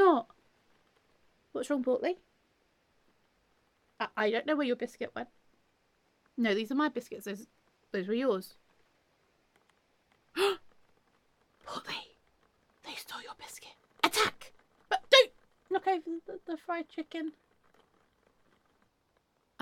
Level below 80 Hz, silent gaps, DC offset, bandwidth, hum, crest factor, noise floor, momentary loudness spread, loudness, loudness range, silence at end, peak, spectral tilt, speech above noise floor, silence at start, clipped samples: -78 dBFS; none; under 0.1%; 17 kHz; none; 28 dB; -74 dBFS; 17 LU; -32 LUFS; 10 LU; 2.3 s; -6 dBFS; -3 dB/octave; 41 dB; 0 s; under 0.1%